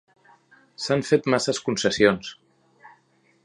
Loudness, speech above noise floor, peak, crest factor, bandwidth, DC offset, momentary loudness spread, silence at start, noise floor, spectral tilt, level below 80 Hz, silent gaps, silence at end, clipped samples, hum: -22 LUFS; 41 dB; -2 dBFS; 24 dB; 11 kHz; under 0.1%; 12 LU; 0.8 s; -63 dBFS; -4 dB/octave; -58 dBFS; none; 0.55 s; under 0.1%; none